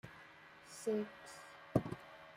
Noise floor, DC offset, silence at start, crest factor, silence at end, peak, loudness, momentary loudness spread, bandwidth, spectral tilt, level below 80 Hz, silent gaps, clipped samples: -59 dBFS; under 0.1%; 0.05 s; 26 dB; 0 s; -18 dBFS; -42 LUFS; 18 LU; 16 kHz; -6.5 dB/octave; -68 dBFS; none; under 0.1%